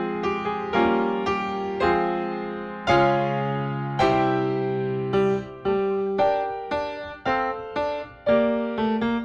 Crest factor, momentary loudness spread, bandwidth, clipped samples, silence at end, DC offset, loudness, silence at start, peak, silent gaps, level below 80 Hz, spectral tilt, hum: 18 dB; 8 LU; 8 kHz; under 0.1%; 0 s; under 0.1%; -24 LUFS; 0 s; -6 dBFS; none; -50 dBFS; -7 dB/octave; none